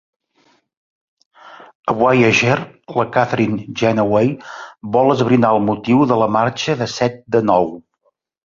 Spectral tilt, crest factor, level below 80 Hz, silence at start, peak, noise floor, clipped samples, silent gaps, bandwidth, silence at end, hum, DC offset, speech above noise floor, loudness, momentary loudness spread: -6 dB/octave; 16 dB; -52 dBFS; 1.45 s; 0 dBFS; -65 dBFS; under 0.1%; 1.75-1.83 s; 7.6 kHz; 0.65 s; none; under 0.1%; 49 dB; -16 LUFS; 10 LU